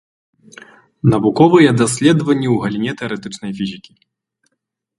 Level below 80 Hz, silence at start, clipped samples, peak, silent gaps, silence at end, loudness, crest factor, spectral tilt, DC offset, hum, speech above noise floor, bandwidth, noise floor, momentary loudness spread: -52 dBFS; 1.05 s; under 0.1%; 0 dBFS; none; 1.2 s; -15 LUFS; 16 dB; -6 dB/octave; under 0.1%; none; 60 dB; 11.5 kHz; -75 dBFS; 15 LU